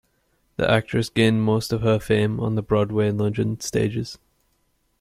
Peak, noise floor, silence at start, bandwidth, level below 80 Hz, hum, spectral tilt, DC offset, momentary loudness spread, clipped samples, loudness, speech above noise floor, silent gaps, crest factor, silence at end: -4 dBFS; -68 dBFS; 0.6 s; 15 kHz; -48 dBFS; none; -6 dB/octave; under 0.1%; 6 LU; under 0.1%; -22 LUFS; 46 dB; none; 18 dB; 0.85 s